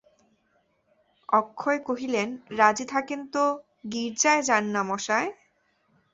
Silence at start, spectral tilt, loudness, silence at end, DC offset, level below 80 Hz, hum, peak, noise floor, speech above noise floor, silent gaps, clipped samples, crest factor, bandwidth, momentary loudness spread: 1.3 s; -2.5 dB/octave; -26 LUFS; 0.8 s; under 0.1%; -72 dBFS; none; -4 dBFS; -69 dBFS; 44 dB; none; under 0.1%; 22 dB; 8 kHz; 10 LU